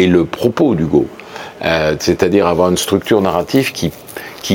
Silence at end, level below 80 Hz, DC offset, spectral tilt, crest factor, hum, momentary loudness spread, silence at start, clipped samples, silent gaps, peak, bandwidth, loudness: 0 s; -40 dBFS; under 0.1%; -5.5 dB/octave; 14 dB; none; 12 LU; 0 s; under 0.1%; none; 0 dBFS; 17 kHz; -14 LUFS